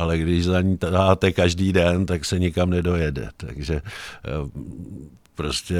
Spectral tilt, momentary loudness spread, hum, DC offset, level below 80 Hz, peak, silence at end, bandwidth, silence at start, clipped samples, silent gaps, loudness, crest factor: -6 dB/octave; 17 LU; none; under 0.1%; -36 dBFS; -2 dBFS; 0 s; 14 kHz; 0 s; under 0.1%; none; -22 LUFS; 20 dB